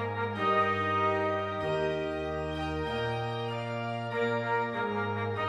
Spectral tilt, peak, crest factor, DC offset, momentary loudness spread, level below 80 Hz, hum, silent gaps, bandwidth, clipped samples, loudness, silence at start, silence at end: -6.5 dB/octave; -14 dBFS; 16 dB; under 0.1%; 7 LU; -52 dBFS; none; none; 11 kHz; under 0.1%; -31 LUFS; 0 s; 0 s